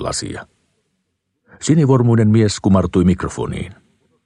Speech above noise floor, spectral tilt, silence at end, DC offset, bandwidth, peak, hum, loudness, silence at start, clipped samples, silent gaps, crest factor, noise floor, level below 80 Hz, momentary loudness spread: 56 dB; -6.5 dB/octave; 0.55 s; under 0.1%; 11 kHz; -2 dBFS; none; -16 LUFS; 0 s; under 0.1%; none; 16 dB; -71 dBFS; -40 dBFS; 16 LU